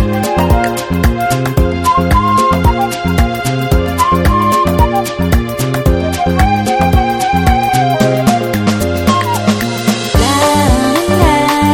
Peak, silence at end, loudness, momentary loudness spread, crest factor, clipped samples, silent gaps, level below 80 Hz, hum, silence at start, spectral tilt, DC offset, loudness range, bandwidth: 0 dBFS; 0 s; -12 LUFS; 4 LU; 12 dB; under 0.1%; none; -20 dBFS; none; 0 s; -5.5 dB/octave; under 0.1%; 1 LU; 17.5 kHz